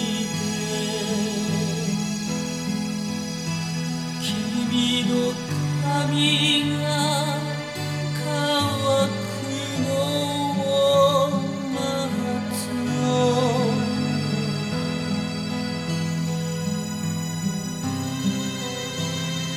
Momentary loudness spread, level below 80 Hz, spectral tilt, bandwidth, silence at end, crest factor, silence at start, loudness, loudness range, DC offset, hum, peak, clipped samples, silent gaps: 8 LU; -56 dBFS; -4.5 dB/octave; 16 kHz; 0 s; 18 dB; 0 s; -24 LUFS; 5 LU; under 0.1%; none; -6 dBFS; under 0.1%; none